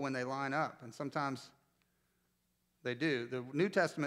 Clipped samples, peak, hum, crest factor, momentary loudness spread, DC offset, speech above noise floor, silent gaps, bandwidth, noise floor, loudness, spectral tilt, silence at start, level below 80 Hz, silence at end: under 0.1%; -18 dBFS; none; 20 dB; 11 LU; under 0.1%; 43 dB; none; 15 kHz; -79 dBFS; -37 LUFS; -5.5 dB/octave; 0 s; -86 dBFS; 0 s